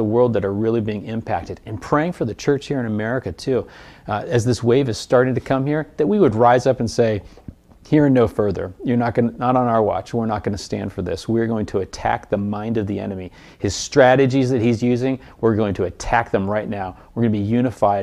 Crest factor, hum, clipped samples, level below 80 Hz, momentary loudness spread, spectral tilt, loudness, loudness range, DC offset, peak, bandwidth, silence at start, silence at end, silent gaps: 18 dB; none; under 0.1%; -44 dBFS; 11 LU; -6.5 dB/octave; -20 LUFS; 5 LU; under 0.1%; -2 dBFS; 12.5 kHz; 0 s; 0 s; none